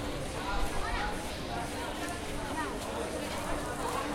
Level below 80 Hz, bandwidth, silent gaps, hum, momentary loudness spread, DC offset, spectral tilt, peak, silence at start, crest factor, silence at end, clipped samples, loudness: -42 dBFS; 16.5 kHz; none; none; 3 LU; under 0.1%; -4 dB/octave; -20 dBFS; 0 s; 14 dB; 0 s; under 0.1%; -36 LUFS